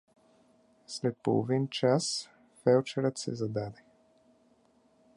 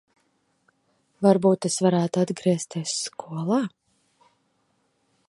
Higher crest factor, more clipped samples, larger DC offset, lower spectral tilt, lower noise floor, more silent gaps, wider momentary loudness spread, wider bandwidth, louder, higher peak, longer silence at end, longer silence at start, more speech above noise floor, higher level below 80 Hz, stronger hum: about the same, 20 dB vs 22 dB; neither; neither; about the same, -5.5 dB/octave vs -5.5 dB/octave; second, -66 dBFS vs -70 dBFS; neither; about the same, 10 LU vs 10 LU; about the same, 11.5 kHz vs 11.5 kHz; second, -30 LUFS vs -24 LUFS; second, -12 dBFS vs -4 dBFS; second, 1.45 s vs 1.6 s; second, 0.9 s vs 1.2 s; second, 37 dB vs 47 dB; about the same, -72 dBFS vs -72 dBFS; neither